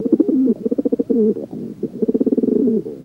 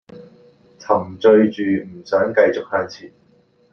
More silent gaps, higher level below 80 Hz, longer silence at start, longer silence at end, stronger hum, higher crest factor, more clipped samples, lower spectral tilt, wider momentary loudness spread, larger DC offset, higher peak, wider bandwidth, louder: neither; first, -58 dBFS vs -64 dBFS; about the same, 0 s vs 0.1 s; second, 0 s vs 0.65 s; neither; about the same, 16 dB vs 18 dB; neither; first, -11 dB/octave vs -7 dB/octave; second, 11 LU vs 14 LU; neither; about the same, -2 dBFS vs -2 dBFS; second, 2.1 kHz vs 6.6 kHz; about the same, -18 LUFS vs -18 LUFS